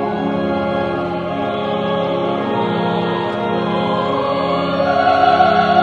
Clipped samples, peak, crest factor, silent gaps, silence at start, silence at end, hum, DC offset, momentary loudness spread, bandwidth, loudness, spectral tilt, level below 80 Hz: under 0.1%; 0 dBFS; 16 dB; none; 0 s; 0 s; none; under 0.1%; 7 LU; 8.2 kHz; -17 LUFS; -7.5 dB/octave; -50 dBFS